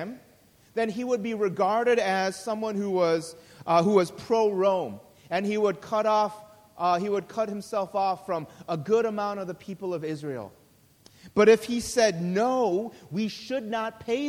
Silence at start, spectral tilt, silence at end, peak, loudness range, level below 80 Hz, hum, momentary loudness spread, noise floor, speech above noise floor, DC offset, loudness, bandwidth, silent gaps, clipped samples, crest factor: 0 s; -5 dB/octave; 0 s; -8 dBFS; 4 LU; -64 dBFS; none; 12 LU; -58 dBFS; 32 dB; under 0.1%; -26 LUFS; 16 kHz; none; under 0.1%; 20 dB